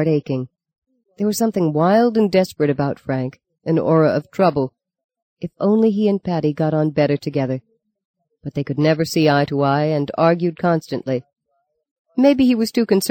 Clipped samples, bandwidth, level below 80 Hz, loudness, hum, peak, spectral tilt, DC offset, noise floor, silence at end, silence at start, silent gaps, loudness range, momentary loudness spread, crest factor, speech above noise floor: under 0.1%; 17 kHz; -56 dBFS; -18 LUFS; none; -2 dBFS; -6.5 dB/octave; under 0.1%; -71 dBFS; 0 s; 0 s; 0.78-0.82 s, 5.04-5.09 s, 5.22-5.36 s, 8.05-8.14 s, 11.91-12.05 s; 2 LU; 11 LU; 16 dB; 53 dB